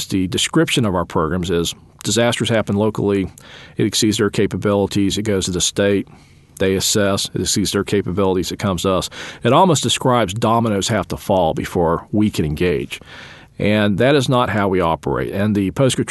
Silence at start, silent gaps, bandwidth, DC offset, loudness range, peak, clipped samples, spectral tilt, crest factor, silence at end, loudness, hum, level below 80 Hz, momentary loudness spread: 0 s; none; 12.5 kHz; under 0.1%; 2 LU; -2 dBFS; under 0.1%; -4.5 dB/octave; 16 dB; 0 s; -18 LUFS; none; -42 dBFS; 7 LU